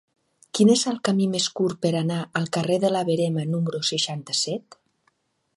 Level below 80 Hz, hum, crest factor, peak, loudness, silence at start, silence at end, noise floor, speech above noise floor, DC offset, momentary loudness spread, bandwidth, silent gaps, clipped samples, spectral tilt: -70 dBFS; none; 18 dB; -6 dBFS; -23 LUFS; 0.55 s; 0.95 s; -69 dBFS; 46 dB; under 0.1%; 7 LU; 11.5 kHz; none; under 0.1%; -4.5 dB/octave